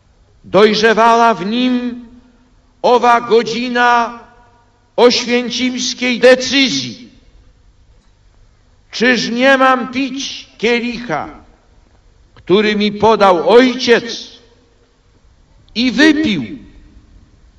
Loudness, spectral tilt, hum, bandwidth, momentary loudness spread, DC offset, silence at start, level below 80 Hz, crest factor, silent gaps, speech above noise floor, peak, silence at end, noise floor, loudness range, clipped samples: -12 LUFS; -4 dB/octave; none; 11 kHz; 15 LU; under 0.1%; 0.45 s; -48 dBFS; 14 dB; none; 39 dB; 0 dBFS; 0.95 s; -51 dBFS; 4 LU; 0.4%